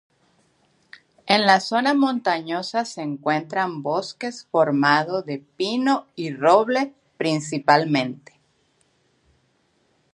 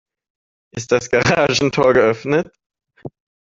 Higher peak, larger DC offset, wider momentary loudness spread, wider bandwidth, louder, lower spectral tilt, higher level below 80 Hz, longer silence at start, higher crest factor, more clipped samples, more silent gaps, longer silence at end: about the same, 0 dBFS vs -2 dBFS; neither; second, 13 LU vs 24 LU; first, 11.5 kHz vs 7.8 kHz; second, -21 LUFS vs -16 LUFS; about the same, -5 dB/octave vs -4.5 dB/octave; second, -74 dBFS vs -50 dBFS; first, 1.25 s vs 0.75 s; first, 22 dB vs 16 dB; neither; second, none vs 2.66-2.70 s; first, 1.95 s vs 0.4 s